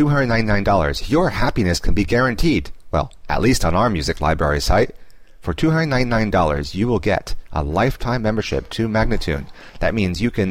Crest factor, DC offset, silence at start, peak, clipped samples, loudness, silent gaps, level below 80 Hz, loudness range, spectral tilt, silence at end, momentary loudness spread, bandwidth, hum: 12 dB; 0.8%; 0 s; -6 dBFS; under 0.1%; -19 LUFS; none; -28 dBFS; 2 LU; -6 dB/octave; 0 s; 7 LU; 16 kHz; none